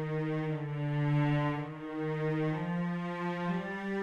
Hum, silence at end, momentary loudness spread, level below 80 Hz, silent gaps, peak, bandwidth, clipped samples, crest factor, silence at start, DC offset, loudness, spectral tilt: none; 0 s; 6 LU; -62 dBFS; none; -20 dBFS; 6.8 kHz; under 0.1%; 14 dB; 0 s; under 0.1%; -33 LUFS; -9 dB/octave